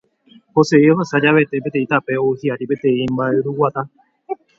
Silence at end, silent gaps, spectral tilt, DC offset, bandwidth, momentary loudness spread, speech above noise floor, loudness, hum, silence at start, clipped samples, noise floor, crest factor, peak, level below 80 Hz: 0.25 s; none; -7 dB/octave; under 0.1%; 7.8 kHz; 10 LU; 34 dB; -17 LUFS; none; 0.55 s; under 0.1%; -50 dBFS; 18 dB; 0 dBFS; -58 dBFS